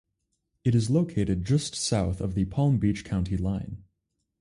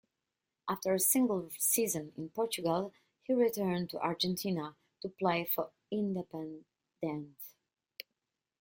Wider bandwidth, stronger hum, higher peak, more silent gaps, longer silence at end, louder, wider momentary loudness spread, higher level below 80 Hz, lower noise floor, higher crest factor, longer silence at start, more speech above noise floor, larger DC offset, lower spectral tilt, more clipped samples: second, 11.5 kHz vs 17 kHz; neither; first, -12 dBFS vs -16 dBFS; neither; second, 0.6 s vs 1.1 s; first, -27 LUFS vs -33 LUFS; second, 7 LU vs 20 LU; first, -42 dBFS vs -76 dBFS; second, -79 dBFS vs -88 dBFS; about the same, 16 dB vs 20 dB; about the same, 0.65 s vs 0.65 s; about the same, 54 dB vs 55 dB; neither; first, -6.5 dB/octave vs -4 dB/octave; neither